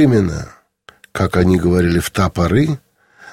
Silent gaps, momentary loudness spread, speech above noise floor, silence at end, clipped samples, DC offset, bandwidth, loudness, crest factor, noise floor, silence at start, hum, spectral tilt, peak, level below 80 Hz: none; 14 LU; 32 dB; 0 s; under 0.1%; 0.4%; 16.5 kHz; -16 LUFS; 16 dB; -47 dBFS; 0 s; none; -7 dB/octave; 0 dBFS; -34 dBFS